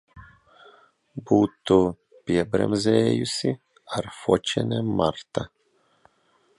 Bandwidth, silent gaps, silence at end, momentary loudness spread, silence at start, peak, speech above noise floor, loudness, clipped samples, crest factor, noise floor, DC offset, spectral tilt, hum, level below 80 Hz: 11.5 kHz; none; 1.1 s; 13 LU; 0.15 s; -4 dBFS; 42 dB; -24 LUFS; under 0.1%; 20 dB; -65 dBFS; under 0.1%; -6 dB/octave; none; -52 dBFS